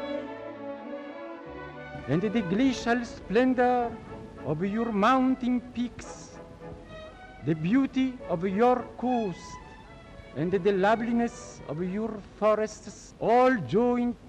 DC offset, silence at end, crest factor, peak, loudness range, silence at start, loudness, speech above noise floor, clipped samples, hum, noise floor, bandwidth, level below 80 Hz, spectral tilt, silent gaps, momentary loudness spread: under 0.1%; 0 s; 14 dB; -14 dBFS; 3 LU; 0 s; -27 LUFS; 21 dB; under 0.1%; none; -47 dBFS; 9 kHz; -54 dBFS; -6.5 dB/octave; none; 20 LU